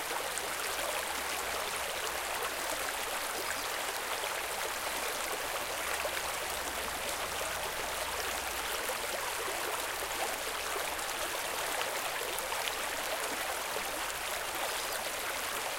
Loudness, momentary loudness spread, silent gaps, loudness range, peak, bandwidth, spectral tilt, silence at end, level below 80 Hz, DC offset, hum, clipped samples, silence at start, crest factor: -34 LUFS; 1 LU; none; 0 LU; -14 dBFS; 17 kHz; -0.5 dB/octave; 0 s; -58 dBFS; under 0.1%; none; under 0.1%; 0 s; 22 dB